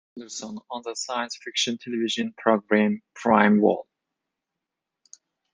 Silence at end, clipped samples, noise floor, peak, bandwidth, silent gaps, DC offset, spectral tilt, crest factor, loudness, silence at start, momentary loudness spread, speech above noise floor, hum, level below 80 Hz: 1.7 s; under 0.1%; -85 dBFS; -2 dBFS; 9.6 kHz; none; under 0.1%; -4.5 dB/octave; 24 dB; -24 LUFS; 0.15 s; 16 LU; 61 dB; none; -72 dBFS